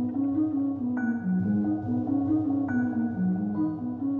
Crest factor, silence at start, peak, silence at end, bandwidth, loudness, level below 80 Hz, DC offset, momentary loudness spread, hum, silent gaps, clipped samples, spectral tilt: 10 dB; 0 s; -16 dBFS; 0 s; 2.4 kHz; -27 LUFS; -62 dBFS; under 0.1%; 3 LU; none; none; under 0.1%; -11.5 dB/octave